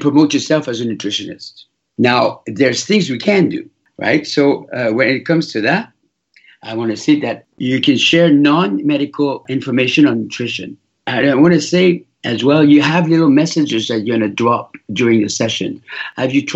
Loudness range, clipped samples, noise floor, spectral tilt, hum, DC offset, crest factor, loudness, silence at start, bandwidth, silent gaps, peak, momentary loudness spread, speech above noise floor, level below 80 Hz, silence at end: 4 LU; under 0.1%; -55 dBFS; -5 dB/octave; none; under 0.1%; 14 dB; -14 LUFS; 0 s; 8 kHz; none; 0 dBFS; 12 LU; 41 dB; -60 dBFS; 0 s